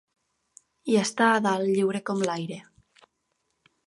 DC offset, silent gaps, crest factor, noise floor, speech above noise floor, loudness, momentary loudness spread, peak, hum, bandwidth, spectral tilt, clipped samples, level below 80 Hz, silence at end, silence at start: under 0.1%; none; 20 dB; -76 dBFS; 52 dB; -25 LUFS; 16 LU; -8 dBFS; none; 11.5 kHz; -4.5 dB/octave; under 0.1%; -74 dBFS; 1.25 s; 0.85 s